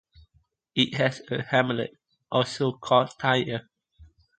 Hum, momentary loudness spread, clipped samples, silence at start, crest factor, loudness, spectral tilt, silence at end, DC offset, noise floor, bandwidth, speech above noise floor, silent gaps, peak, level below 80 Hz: none; 10 LU; under 0.1%; 0.75 s; 22 dB; -26 LUFS; -5.5 dB/octave; 0.35 s; under 0.1%; -67 dBFS; 9.2 kHz; 42 dB; none; -6 dBFS; -62 dBFS